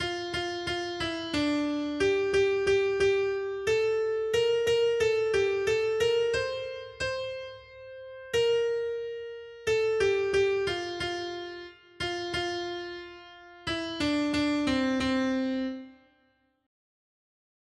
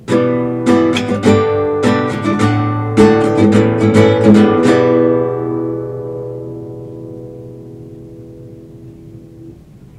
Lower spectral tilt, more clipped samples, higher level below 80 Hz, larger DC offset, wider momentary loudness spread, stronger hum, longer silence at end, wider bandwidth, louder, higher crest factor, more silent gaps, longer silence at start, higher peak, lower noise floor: second, -4.5 dB/octave vs -7 dB/octave; second, under 0.1% vs 0.1%; second, -56 dBFS vs -46 dBFS; neither; second, 14 LU vs 23 LU; neither; first, 1.7 s vs 0.45 s; first, 12.5 kHz vs 11 kHz; second, -28 LUFS vs -12 LUFS; about the same, 14 dB vs 14 dB; neither; about the same, 0 s vs 0 s; second, -14 dBFS vs 0 dBFS; first, -69 dBFS vs -37 dBFS